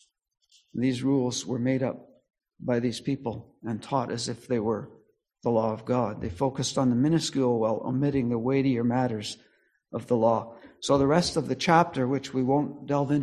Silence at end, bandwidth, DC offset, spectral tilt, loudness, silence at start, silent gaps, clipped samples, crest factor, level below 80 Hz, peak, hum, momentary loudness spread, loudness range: 0 s; 12 kHz; under 0.1%; -6 dB/octave; -27 LUFS; 0.75 s; none; under 0.1%; 22 dB; -56 dBFS; -4 dBFS; none; 13 LU; 5 LU